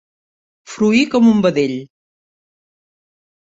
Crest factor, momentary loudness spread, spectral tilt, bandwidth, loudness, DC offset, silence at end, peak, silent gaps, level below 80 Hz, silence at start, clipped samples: 16 dB; 14 LU; -6 dB/octave; 7.8 kHz; -14 LUFS; under 0.1%; 1.6 s; -2 dBFS; none; -58 dBFS; 0.7 s; under 0.1%